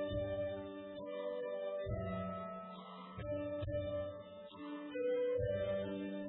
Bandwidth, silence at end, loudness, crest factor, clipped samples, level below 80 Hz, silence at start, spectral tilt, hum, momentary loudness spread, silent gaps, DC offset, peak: 4 kHz; 0 s; -42 LUFS; 14 dB; under 0.1%; -58 dBFS; 0 s; -6 dB/octave; none; 12 LU; none; under 0.1%; -28 dBFS